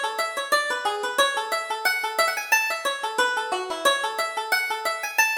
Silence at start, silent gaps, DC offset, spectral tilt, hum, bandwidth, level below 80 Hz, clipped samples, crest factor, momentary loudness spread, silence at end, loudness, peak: 0 s; none; under 0.1%; 1.5 dB/octave; none; over 20 kHz; -68 dBFS; under 0.1%; 18 dB; 5 LU; 0 s; -23 LUFS; -6 dBFS